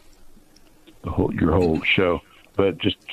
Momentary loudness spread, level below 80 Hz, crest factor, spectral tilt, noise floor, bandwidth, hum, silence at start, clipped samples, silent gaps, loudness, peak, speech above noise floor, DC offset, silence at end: 10 LU; -40 dBFS; 18 dB; -7 dB/octave; -51 dBFS; 14 kHz; none; 0.25 s; under 0.1%; none; -22 LUFS; -4 dBFS; 30 dB; under 0.1%; 0 s